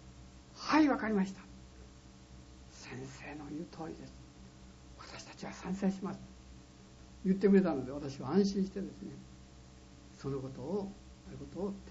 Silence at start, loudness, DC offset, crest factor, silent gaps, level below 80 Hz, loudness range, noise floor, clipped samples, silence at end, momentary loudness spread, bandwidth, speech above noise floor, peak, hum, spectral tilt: 0 s; -35 LUFS; under 0.1%; 20 dB; none; -58 dBFS; 14 LU; -56 dBFS; under 0.1%; 0 s; 27 LU; 7.6 kHz; 20 dB; -16 dBFS; none; -6.5 dB/octave